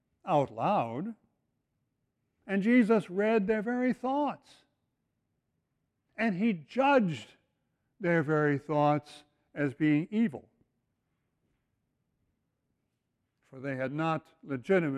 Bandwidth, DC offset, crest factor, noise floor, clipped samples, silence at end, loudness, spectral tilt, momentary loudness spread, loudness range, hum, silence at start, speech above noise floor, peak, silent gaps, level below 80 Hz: 10 kHz; under 0.1%; 18 dB; -81 dBFS; under 0.1%; 0 s; -30 LUFS; -8 dB/octave; 14 LU; 9 LU; none; 0.25 s; 53 dB; -14 dBFS; none; -74 dBFS